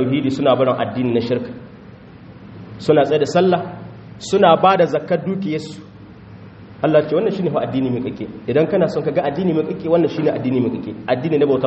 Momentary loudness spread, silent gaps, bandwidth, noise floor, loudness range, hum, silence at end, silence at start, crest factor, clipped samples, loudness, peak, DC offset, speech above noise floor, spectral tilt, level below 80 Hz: 17 LU; none; 8 kHz; -40 dBFS; 4 LU; none; 0 s; 0 s; 18 dB; under 0.1%; -18 LUFS; 0 dBFS; under 0.1%; 23 dB; -5.5 dB/octave; -54 dBFS